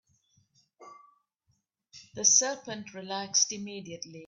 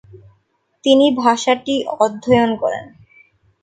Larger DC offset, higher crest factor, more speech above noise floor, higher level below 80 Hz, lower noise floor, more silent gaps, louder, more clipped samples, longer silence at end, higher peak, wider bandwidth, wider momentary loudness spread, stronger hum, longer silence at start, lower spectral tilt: neither; first, 26 dB vs 18 dB; about the same, 46 dB vs 48 dB; second, -78 dBFS vs -54 dBFS; first, -76 dBFS vs -63 dBFS; neither; second, -26 LUFS vs -16 LUFS; neither; second, 0 s vs 0.75 s; second, -8 dBFS vs 0 dBFS; first, 10.5 kHz vs 9.4 kHz; first, 19 LU vs 10 LU; neither; first, 0.8 s vs 0.15 s; second, -0.5 dB/octave vs -4.5 dB/octave